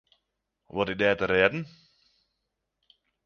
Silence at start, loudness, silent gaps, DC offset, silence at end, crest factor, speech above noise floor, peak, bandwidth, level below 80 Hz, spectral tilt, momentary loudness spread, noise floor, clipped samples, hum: 0.75 s; -26 LUFS; none; under 0.1%; 1.6 s; 26 dB; 56 dB; -6 dBFS; 6.8 kHz; -58 dBFS; -6.5 dB/octave; 14 LU; -82 dBFS; under 0.1%; none